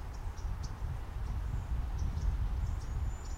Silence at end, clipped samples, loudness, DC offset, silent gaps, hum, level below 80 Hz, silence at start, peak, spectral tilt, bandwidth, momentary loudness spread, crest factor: 0 s; under 0.1%; -39 LUFS; under 0.1%; none; none; -36 dBFS; 0 s; -22 dBFS; -6.5 dB/octave; 12.5 kHz; 5 LU; 14 dB